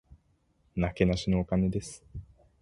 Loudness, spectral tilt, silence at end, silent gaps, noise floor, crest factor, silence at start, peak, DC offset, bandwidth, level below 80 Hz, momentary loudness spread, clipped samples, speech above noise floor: -29 LUFS; -7 dB/octave; 0.4 s; none; -69 dBFS; 22 dB; 0.1 s; -8 dBFS; under 0.1%; 11.5 kHz; -44 dBFS; 19 LU; under 0.1%; 41 dB